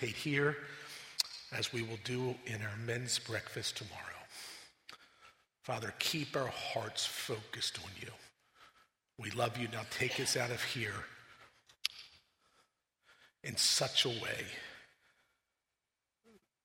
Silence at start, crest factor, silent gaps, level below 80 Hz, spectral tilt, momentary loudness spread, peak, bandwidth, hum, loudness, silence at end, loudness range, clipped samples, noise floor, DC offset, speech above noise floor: 0 s; 28 dB; none; -74 dBFS; -2.5 dB/octave; 18 LU; -12 dBFS; 16 kHz; none; -37 LUFS; 0.25 s; 5 LU; under 0.1%; -90 dBFS; under 0.1%; 52 dB